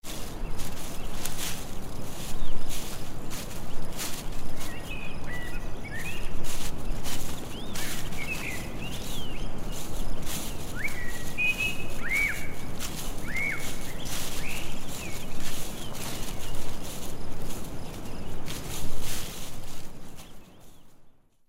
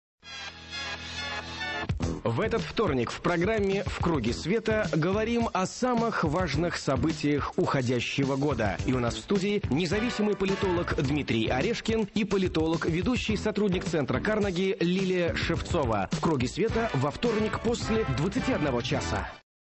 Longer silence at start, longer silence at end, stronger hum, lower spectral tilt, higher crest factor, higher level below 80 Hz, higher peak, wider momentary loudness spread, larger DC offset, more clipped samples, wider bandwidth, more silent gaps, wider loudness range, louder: second, 0.05 s vs 0.25 s; first, 0.4 s vs 0.25 s; neither; second, -3 dB/octave vs -6 dB/octave; about the same, 14 dB vs 12 dB; first, -34 dBFS vs -42 dBFS; first, -8 dBFS vs -16 dBFS; first, 10 LU vs 5 LU; neither; neither; first, 16 kHz vs 8.6 kHz; neither; first, 8 LU vs 1 LU; second, -35 LUFS vs -28 LUFS